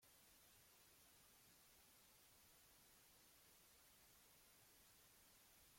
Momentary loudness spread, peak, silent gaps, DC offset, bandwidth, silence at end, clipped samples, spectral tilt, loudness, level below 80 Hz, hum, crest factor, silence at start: 0 LU; -58 dBFS; none; under 0.1%; 16.5 kHz; 0 s; under 0.1%; -1.5 dB/octave; -69 LUFS; -86 dBFS; none; 12 dB; 0 s